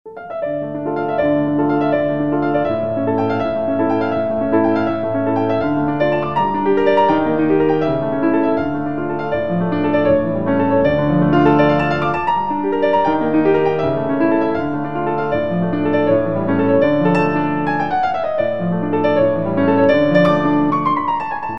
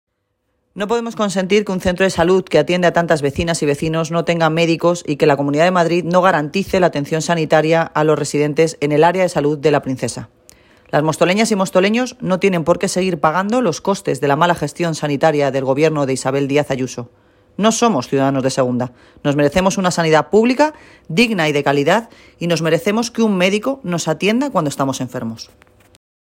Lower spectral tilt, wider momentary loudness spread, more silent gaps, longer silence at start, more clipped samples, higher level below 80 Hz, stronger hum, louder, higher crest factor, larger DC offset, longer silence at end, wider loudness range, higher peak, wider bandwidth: first, -9 dB/octave vs -5 dB/octave; about the same, 6 LU vs 7 LU; neither; second, 0.05 s vs 0.75 s; neither; about the same, -46 dBFS vs -48 dBFS; neither; about the same, -17 LUFS vs -16 LUFS; about the same, 16 dB vs 16 dB; first, 2% vs under 0.1%; second, 0 s vs 0.9 s; about the same, 2 LU vs 2 LU; about the same, 0 dBFS vs 0 dBFS; second, 6 kHz vs 16.5 kHz